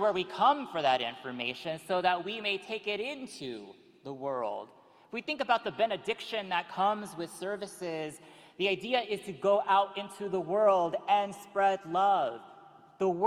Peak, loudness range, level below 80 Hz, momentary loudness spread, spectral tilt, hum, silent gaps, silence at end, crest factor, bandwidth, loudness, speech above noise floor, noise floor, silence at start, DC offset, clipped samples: -12 dBFS; 6 LU; -76 dBFS; 13 LU; -4.5 dB/octave; none; none; 0 s; 18 dB; 16 kHz; -31 LUFS; 24 dB; -55 dBFS; 0 s; under 0.1%; under 0.1%